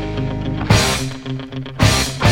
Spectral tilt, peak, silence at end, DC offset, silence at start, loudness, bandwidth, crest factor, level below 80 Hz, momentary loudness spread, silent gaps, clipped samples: -4.5 dB/octave; 0 dBFS; 0 s; under 0.1%; 0 s; -18 LUFS; 16.5 kHz; 18 dB; -30 dBFS; 12 LU; none; under 0.1%